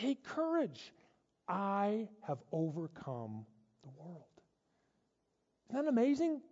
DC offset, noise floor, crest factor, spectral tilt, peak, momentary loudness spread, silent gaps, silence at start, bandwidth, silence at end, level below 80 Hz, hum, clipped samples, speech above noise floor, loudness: under 0.1%; -82 dBFS; 16 dB; -6.5 dB/octave; -24 dBFS; 21 LU; none; 0 s; 7.6 kHz; 0.05 s; -84 dBFS; none; under 0.1%; 45 dB; -37 LUFS